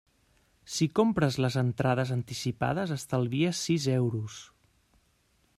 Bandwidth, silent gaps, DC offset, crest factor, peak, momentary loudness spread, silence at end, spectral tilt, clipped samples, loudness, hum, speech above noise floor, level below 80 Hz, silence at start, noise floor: 14.5 kHz; none; under 0.1%; 18 dB; -10 dBFS; 8 LU; 1.15 s; -6 dB/octave; under 0.1%; -29 LUFS; none; 41 dB; -60 dBFS; 0.65 s; -69 dBFS